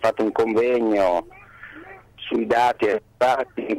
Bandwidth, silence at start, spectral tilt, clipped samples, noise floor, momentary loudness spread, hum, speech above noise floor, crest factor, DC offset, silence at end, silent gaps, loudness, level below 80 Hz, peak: 15.5 kHz; 0 s; -5.5 dB/octave; under 0.1%; -43 dBFS; 21 LU; 50 Hz at -60 dBFS; 22 dB; 14 dB; under 0.1%; 0 s; none; -21 LUFS; -54 dBFS; -8 dBFS